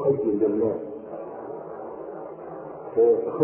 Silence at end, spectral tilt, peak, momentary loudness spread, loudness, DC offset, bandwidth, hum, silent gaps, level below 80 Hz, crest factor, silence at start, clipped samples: 0 s; -13.5 dB/octave; -8 dBFS; 17 LU; -26 LUFS; under 0.1%; 2.8 kHz; none; none; -64 dBFS; 18 dB; 0 s; under 0.1%